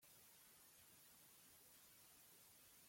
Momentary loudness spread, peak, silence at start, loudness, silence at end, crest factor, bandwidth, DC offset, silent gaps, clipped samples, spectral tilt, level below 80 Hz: 0 LU; -54 dBFS; 0 s; -66 LUFS; 0 s; 14 dB; 16.5 kHz; under 0.1%; none; under 0.1%; -1 dB/octave; under -90 dBFS